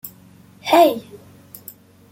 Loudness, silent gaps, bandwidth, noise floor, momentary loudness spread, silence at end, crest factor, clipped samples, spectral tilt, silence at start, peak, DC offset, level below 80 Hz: -15 LUFS; none; 17 kHz; -47 dBFS; 24 LU; 0.95 s; 20 dB; under 0.1%; -4 dB/octave; 0.05 s; -2 dBFS; under 0.1%; -66 dBFS